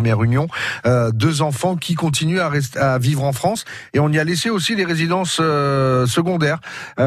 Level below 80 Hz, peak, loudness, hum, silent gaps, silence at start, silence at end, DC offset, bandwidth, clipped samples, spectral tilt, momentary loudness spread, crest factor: -50 dBFS; -4 dBFS; -18 LUFS; none; none; 0 s; 0 s; under 0.1%; 14 kHz; under 0.1%; -5.5 dB/octave; 4 LU; 14 dB